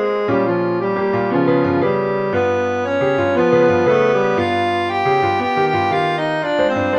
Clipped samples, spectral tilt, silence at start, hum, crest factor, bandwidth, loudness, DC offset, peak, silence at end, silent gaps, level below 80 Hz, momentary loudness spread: under 0.1%; -7 dB/octave; 0 s; none; 14 dB; 9.4 kHz; -17 LUFS; under 0.1%; -2 dBFS; 0 s; none; -54 dBFS; 5 LU